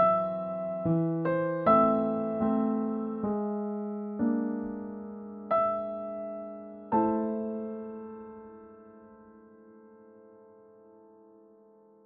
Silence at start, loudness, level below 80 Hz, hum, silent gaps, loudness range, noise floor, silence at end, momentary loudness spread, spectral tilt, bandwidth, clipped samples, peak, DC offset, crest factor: 0 s; -30 LUFS; -66 dBFS; none; none; 13 LU; -58 dBFS; 1.7 s; 17 LU; -8.5 dB/octave; 4.3 kHz; under 0.1%; -10 dBFS; under 0.1%; 20 dB